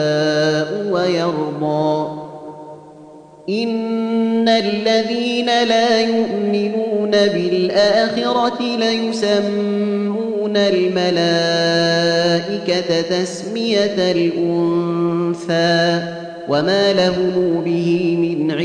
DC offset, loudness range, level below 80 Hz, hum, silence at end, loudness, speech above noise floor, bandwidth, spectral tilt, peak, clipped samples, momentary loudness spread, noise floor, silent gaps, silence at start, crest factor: under 0.1%; 4 LU; -60 dBFS; none; 0 s; -17 LUFS; 24 dB; 10 kHz; -5.5 dB/octave; -4 dBFS; under 0.1%; 6 LU; -40 dBFS; none; 0 s; 14 dB